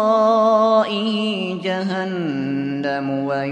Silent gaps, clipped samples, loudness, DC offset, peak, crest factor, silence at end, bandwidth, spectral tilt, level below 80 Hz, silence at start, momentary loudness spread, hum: none; under 0.1%; -19 LUFS; under 0.1%; -4 dBFS; 14 dB; 0 s; 9.6 kHz; -6.5 dB/octave; -70 dBFS; 0 s; 8 LU; none